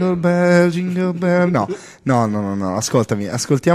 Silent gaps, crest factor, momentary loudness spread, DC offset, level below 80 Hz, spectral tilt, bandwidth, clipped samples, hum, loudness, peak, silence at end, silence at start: none; 14 dB; 7 LU; under 0.1%; -54 dBFS; -6 dB/octave; 14 kHz; under 0.1%; none; -17 LUFS; -2 dBFS; 0 s; 0 s